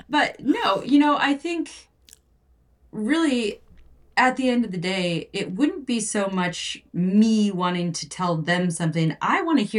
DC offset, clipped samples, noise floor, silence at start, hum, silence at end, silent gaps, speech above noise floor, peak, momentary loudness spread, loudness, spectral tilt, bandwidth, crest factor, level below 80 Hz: under 0.1%; under 0.1%; -60 dBFS; 0.1 s; none; 0 s; none; 38 dB; -6 dBFS; 10 LU; -23 LUFS; -5 dB/octave; 11.5 kHz; 16 dB; -60 dBFS